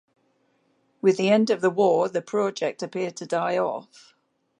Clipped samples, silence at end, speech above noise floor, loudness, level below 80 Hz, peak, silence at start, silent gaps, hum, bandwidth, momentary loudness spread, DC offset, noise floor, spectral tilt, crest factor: under 0.1%; 0.75 s; 44 dB; -24 LUFS; -80 dBFS; -8 dBFS; 1.05 s; none; none; 10.5 kHz; 10 LU; under 0.1%; -68 dBFS; -5.5 dB/octave; 18 dB